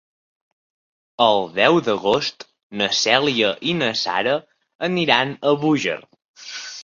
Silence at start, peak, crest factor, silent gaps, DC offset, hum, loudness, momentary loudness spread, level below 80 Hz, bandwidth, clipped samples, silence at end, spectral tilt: 1.2 s; -2 dBFS; 20 dB; 2.63-2.70 s, 4.75-4.79 s, 6.28-6.34 s; under 0.1%; none; -19 LUFS; 14 LU; -62 dBFS; 7.6 kHz; under 0.1%; 0 s; -4 dB/octave